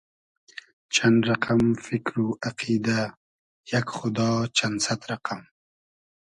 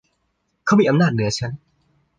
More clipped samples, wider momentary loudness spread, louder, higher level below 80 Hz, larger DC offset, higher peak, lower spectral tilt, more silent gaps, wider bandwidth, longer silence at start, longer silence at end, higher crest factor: neither; about the same, 13 LU vs 14 LU; second, -25 LUFS vs -19 LUFS; about the same, -58 dBFS vs -54 dBFS; neither; about the same, -6 dBFS vs -6 dBFS; second, -4.5 dB/octave vs -6 dB/octave; first, 3.17-3.64 s vs none; first, 11 kHz vs 9.6 kHz; first, 0.9 s vs 0.65 s; first, 0.9 s vs 0.65 s; about the same, 20 dB vs 16 dB